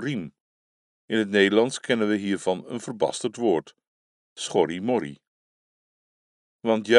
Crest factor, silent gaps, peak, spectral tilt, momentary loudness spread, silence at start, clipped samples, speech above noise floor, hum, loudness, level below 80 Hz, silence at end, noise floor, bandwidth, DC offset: 24 dB; 0.40-1.08 s, 3.87-4.36 s, 5.27-6.59 s; -2 dBFS; -4.5 dB/octave; 13 LU; 0 s; under 0.1%; over 67 dB; none; -25 LUFS; -72 dBFS; 0 s; under -90 dBFS; 11.5 kHz; under 0.1%